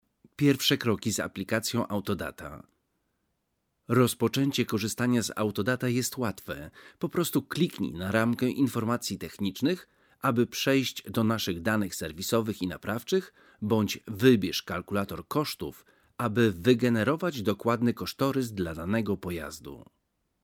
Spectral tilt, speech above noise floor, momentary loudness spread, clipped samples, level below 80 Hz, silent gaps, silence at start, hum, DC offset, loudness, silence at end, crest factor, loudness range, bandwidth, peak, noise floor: -5 dB/octave; 50 dB; 10 LU; under 0.1%; -58 dBFS; none; 0.4 s; none; under 0.1%; -28 LUFS; 0.65 s; 22 dB; 3 LU; 19.5 kHz; -8 dBFS; -78 dBFS